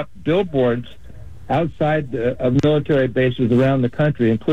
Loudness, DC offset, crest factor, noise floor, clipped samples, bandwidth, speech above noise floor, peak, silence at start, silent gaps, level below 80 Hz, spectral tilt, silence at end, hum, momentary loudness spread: -19 LUFS; 2%; 12 dB; -38 dBFS; under 0.1%; 8 kHz; 21 dB; -6 dBFS; 0 s; none; -44 dBFS; -8.5 dB/octave; 0 s; none; 5 LU